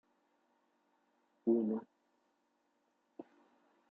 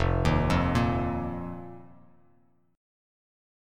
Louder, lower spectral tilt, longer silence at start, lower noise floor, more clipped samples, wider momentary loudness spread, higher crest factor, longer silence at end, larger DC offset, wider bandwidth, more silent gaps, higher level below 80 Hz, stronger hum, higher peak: second, -36 LUFS vs -27 LUFS; first, -11 dB/octave vs -7 dB/octave; first, 1.45 s vs 0 s; first, -80 dBFS vs -66 dBFS; neither; first, 23 LU vs 16 LU; about the same, 22 dB vs 20 dB; second, 0.7 s vs 1.9 s; neither; second, 3 kHz vs 13 kHz; neither; second, under -90 dBFS vs -38 dBFS; neither; second, -22 dBFS vs -10 dBFS